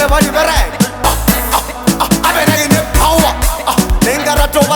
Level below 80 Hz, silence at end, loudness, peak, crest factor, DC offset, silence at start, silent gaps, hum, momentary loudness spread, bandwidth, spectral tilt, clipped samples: -18 dBFS; 0 s; -12 LUFS; 0 dBFS; 12 dB; under 0.1%; 0 s; none; none; 4 LU; over 20 kHz; -4 dB/octave; 0.2%